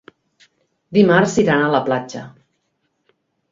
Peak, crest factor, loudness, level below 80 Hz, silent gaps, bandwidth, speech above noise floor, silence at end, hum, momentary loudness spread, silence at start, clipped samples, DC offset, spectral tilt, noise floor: 0 dBFS; 18 dB; -16 LUFS; -56 dBFS; none; 7.8 kHz; 54 dB; 1.25 s; none; 15 LU; 0.9 s; under 0.1%; under 0.1%; -6 dB/octave; -70 dBFS